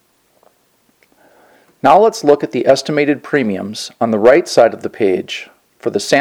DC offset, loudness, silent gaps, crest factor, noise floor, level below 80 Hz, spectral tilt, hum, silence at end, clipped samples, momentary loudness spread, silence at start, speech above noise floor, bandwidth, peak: under 0.1%; -14 LUFS; none; 14 dB; -58 dBFS; -58 dBFS; -4.5 dB/octave; none; 0 s; 0.2%; 12 LU; 1.85 s; 45 dB; 16.5 kHz; 0 dBFS